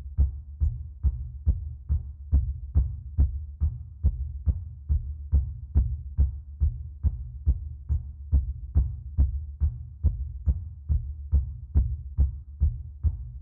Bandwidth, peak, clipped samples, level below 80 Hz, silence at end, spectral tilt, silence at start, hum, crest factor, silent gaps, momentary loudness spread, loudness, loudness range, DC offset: 1.3 kHz; -12 dBFS; under 0.1%; -28 dBFS; 0 s; -13.5 dB/octave; 0 s; none; 16 dB; none; 4 LU; -30 LUFS; 0 LU; under 0.1%